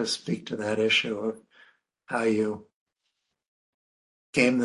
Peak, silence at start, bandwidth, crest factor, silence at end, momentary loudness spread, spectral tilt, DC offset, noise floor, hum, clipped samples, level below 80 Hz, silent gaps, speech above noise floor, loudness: -6 dBFS; 0 s; 11.5 kHz; 22 dB; 0 s; 11 LU; -4 dB/octave; under 0.1%; -80 dBFS; none; under 0.1%; -68 dBFS; 2.74-2.86 s, 3.48-4.33 s; 54 dB; -27 LUFS